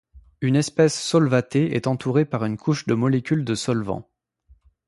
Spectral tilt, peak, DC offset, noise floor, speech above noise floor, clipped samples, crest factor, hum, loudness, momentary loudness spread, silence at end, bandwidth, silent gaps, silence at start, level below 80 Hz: -6 dB/octave; -4 dBFS; under 0.1%; -57 dBFS; 36 dB; under 0.1%; 18 dB; none; -22 LUFS; 6 LU; 0.85 s; 11.5 kHz; none; 0.15 s; -56 dBFS